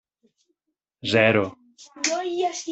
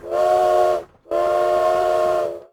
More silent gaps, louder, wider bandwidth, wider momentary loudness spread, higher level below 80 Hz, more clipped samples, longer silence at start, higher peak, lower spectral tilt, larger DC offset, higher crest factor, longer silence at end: neither; second, -23 LUFS vs -19 LUFS; second, 8.4 kHz vs 19 kHz; first, 12 LU vs 7 LU; second, -66 dBFS vs -52 dBFS; neither; first, 1.05 s vs 0.05 s; about the same, -4 dBFS vs -6 dBFS; about the same, -3.5 dB/octave vs -4.5 dB/octave; neither; first, 22 dB vs 12 dB; about the same, 0 s vs 0.1 s